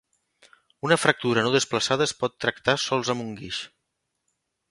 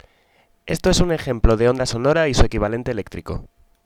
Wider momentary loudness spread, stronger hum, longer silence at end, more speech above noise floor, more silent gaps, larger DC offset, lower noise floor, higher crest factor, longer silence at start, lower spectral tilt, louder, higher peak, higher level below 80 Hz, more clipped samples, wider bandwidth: about the same, 12 LU vs 13 LU; neither; first, 1.05 s vs 0.4 s; first, 55 dB vs 41 dB; neither; neither; first, -79 dBFS vs -59 dBFS; about the same, 24 dB vs 20 dB; first, 0.85 s vs 0.65 s; second, -3.5 dB/octave vs -5.5 dB/octave; second, -24 LUFS vs -20 LUFS; about the same, -2 dBFS vs 0 dBFS; second, -62 dBFS vs -26 dBFS; neither; second, 11.5 kHz vs 15 kHz